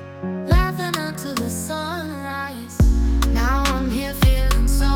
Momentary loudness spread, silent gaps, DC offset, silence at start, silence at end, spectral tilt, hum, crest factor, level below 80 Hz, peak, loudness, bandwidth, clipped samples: 9 LU; none; under 0.1%; 0 s; 0 s; -5 dB/octave; none; 14 dB; -22 dBFS; -4 dBFS; -22 LUFS; 18.5 kHz; under 0.1%